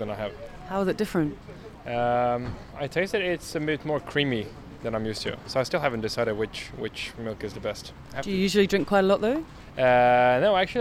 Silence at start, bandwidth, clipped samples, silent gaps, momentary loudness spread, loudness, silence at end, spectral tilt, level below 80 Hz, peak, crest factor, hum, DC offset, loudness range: 0 s; 15.5 kHz; under 0.1%; none; 15 LU; -26 LUFS; 0 s; -5.5 dB/octave; -50 dBFS; -8 dBFS; 18 dB; none; under 0.1%; 6 LU